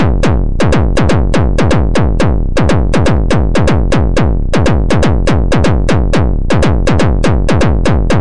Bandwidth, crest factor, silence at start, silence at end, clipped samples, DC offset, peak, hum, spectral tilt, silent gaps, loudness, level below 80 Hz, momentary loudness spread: 11 kHz; 8 dB; 0 s; 0 s; under 0.1%; 20%; 0 dBFS; none; -6.5 dB/octave; none; -12 LUFS; -14 dBFS; 2 LU